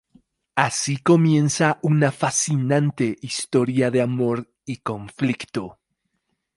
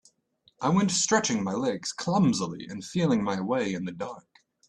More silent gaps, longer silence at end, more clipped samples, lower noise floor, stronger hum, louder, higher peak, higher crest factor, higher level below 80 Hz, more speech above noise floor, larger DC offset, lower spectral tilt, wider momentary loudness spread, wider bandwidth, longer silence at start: neither; first, 0.85 s vs 0.5 s; neither; first, -75 dBFS vs -67 dBFS; neither; first, -21 LUFS vs -27 LUFS; first, 0 dBFS vs -8 dBFS; about the same, 22 dB vs 20 dB; about the same, -62 dBFS vs -64 dBFS; first, 54 dB vs 40 dB; neither; about the same, -5 dB/octave vs -4.5 dB/octave; about the same, 12 LU vs 12 LU; about the same, 11.5 kHz vs 10.5 kHz; about the same, 0.55 s vs 0.6 s